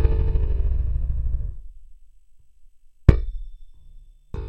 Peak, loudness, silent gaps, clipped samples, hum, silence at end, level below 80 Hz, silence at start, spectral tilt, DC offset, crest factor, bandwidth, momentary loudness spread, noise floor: 0 dBFS; -24 LUFS; none; under 0.1%; none; 0 s; -24 dBFS; 0 s; -9.5 dB/octave; under 0.1%; 22 dB; 5.2 kHz; 21 LU; -48 dBFS